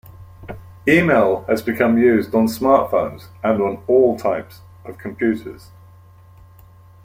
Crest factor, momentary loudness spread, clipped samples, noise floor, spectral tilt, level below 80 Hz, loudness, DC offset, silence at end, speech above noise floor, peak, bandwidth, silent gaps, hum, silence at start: 18 dB; 22 LU; under 0.1%; -45 dBFS; -7 dB/octave; -52 dBFS; -18 LUFS; under 0.1%; 1.5 s; 28 dB; 0 dBFS; 16 kHz; none; none; 0.2 s